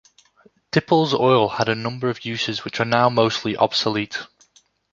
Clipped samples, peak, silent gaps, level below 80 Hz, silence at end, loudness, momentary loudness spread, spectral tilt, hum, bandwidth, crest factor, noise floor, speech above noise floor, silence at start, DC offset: under 0.1%; -2 dBFS; none; -58 dBFS; 0.65 s; -20 LUFS; 8 LU; -5.5 dB/octave; none; 7.6 kHz; 20 dB; -58 dBFS; 38 dB; 0.75 s; under 0.1%